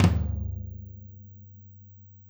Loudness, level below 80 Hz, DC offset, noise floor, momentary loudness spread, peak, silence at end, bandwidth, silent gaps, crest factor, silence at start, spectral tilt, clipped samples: -31 LUFS; -38 dBFS; under 0.1%; -50 dBFS; 21 LU; -6 dBFS; 0.2 s; over 20 kHz; none; 24 dB; 0 s; -7.5 dB/octave; under 0.1%